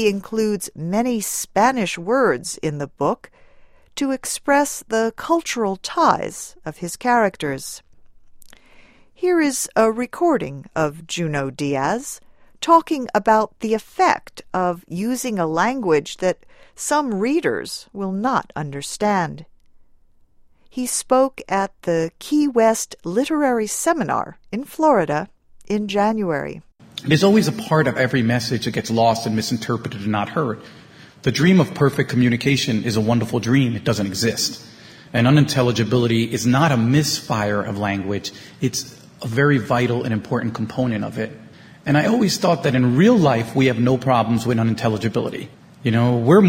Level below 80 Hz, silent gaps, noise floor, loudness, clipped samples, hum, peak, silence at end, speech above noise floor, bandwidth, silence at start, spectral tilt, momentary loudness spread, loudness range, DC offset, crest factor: -54 dBFS; none; -52 dBFS; -20 LUFS; under 0.1%; none; 0 dBFS; 0 s; 33 dB; 16.5 kHz; 0 s; -5.5 dB/octave; 12 LU; 4 LU; under 0.1%; 20 dB